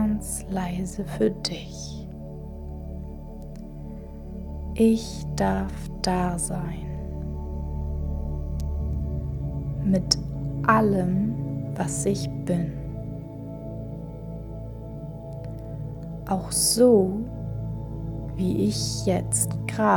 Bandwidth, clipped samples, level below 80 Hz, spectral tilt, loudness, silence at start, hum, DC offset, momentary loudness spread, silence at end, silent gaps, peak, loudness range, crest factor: 19 kHz; under 0.1%; -36 dBFS; -5 dB/octave; -27 LUFS; 0 s; none; under 0.1%; 16 LU; 0 s; none; -2 dBFS; 9 LU; 24 dB